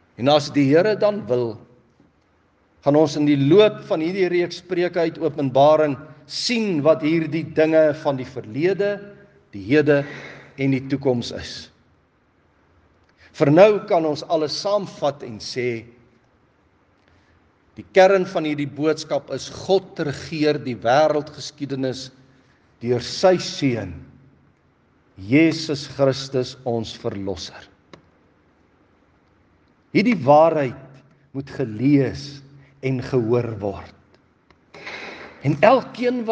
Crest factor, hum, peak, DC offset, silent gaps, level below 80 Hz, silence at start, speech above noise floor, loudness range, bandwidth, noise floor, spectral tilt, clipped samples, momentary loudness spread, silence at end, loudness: 22 dB; none; 0 dBFS; under 0.1%; none; -62 dBFS; 0.2 s; 41 dB; 7 LU; 9.4 kHz; -61 dBFS; -6 dB/octave; under 0.1%; 18 LU; 0 s; -20 LUFS